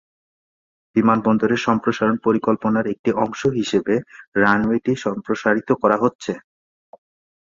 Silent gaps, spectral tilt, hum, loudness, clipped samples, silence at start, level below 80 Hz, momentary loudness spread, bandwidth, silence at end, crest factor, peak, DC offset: 2.99-3.04 s, 4.28-4.32 s, 6.15-6.19 s; -6.5 dB/octave; none; -20 LUFS; under 0.1%; 0.95 s; -56 dBFS; 7 LU; 7.6 kHz; 1.05 s; 18 dB; -2 dBFS; under 0.1%